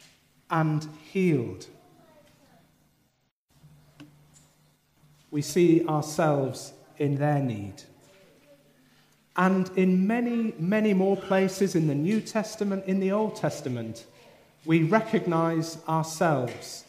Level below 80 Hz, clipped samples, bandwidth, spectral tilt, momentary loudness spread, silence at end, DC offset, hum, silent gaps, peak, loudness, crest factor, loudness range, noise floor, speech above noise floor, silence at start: -72 dBFS; under 0.1%; 15.5 kHz; -6.5 dB/octave; 11 LU; 0.05 s; under 0.1%; none; 3.31-3.48 s; -8 dBFS; -26 LUFS; 20 dB; 7 LU; -71 dBFS; 46 dB; 0.5 s